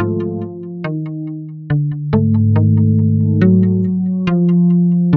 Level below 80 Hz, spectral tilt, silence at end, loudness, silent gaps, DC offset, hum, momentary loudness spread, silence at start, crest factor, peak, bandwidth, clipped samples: -46 dBFS; -11.5 dB/octave; 0 s; -15 LUFS; none; under 0.1%; none; 13 LU; 0 s; 12 dB; -2 dBFS; 4.3 kHz; under 0.1%